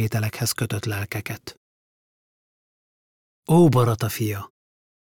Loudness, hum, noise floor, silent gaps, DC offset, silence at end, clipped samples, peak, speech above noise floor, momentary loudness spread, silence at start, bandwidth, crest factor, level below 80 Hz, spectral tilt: -22 LUFS; none; under -90 dBFS; 1.57-3.43 s; under 0.1%; 0.55 s; under 0.1%; -6 dBFS; over 68 dB; 20 LU; 0 s; 18 kHz; 18 dB; -58 dBFS; -6 dB/octave